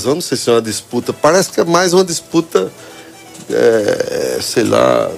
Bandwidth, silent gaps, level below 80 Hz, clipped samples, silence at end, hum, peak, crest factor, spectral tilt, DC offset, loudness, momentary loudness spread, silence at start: 16 kHz; none; -52 dBFS; under 0.1%; 0 s; none; 0 dBFS; 14 dB; -4 dB/octave; under 0.1%; -14 LUFS; 9 LU; 0 s